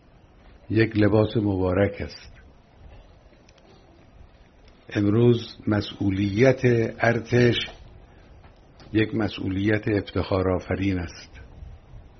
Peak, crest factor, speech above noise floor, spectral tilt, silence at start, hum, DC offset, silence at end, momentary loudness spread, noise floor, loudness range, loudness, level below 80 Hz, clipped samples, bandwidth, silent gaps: -4 dBFS; 20 dB; 30 dB; -6 dB/octave; 0.7 s; none; under 0.1%; 0.2 s; 15 LU; -52 dBFS; 7 LU; -23 LUFS; -48 dBFS; under 0.1%; 6.4 kHz; none